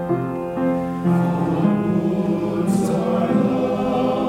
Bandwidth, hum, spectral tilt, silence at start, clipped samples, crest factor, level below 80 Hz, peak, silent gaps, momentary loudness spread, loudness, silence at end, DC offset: 15 kHz; none; -8 dB/octave; 0 s; under 0.1%; 14 dB; -48 dBFS; -6 dBFS; none; 3 LU; -20 LUFS; 0 s; under 0.1%